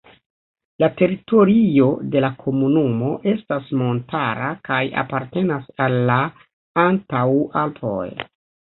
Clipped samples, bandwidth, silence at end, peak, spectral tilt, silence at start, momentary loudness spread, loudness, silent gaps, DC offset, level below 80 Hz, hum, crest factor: under 0.1%; 4.2 kHz; 0.5 s; -2 dBFS; -12.5 dB/octave; 0.8 s; 10 LU; -19 LUFS; 6.53-6.75 s; under 0.1%; -58 dBFS; none; 18 dB